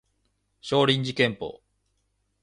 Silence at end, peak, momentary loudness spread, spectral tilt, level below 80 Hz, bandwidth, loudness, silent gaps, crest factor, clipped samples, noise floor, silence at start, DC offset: 0.85 s; -8 dBFS; 16 LU; -5.5 dB/octave; -62 dBFS; 10.5 kHz; -24 LUFS; none; 20 dB; under 0.1%; -73 dBFS; 0.65 s; under 0.1%